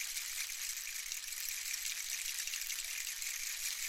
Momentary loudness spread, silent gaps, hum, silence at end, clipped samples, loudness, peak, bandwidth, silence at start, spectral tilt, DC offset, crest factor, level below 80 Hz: 2 LU; none; none; 0 s; under 0.1%; -38 LUFS; -20 dBFS; 17 kHz; 0 s; 5 dB/octave; under 0.1%; 20 dB; -66 dBFS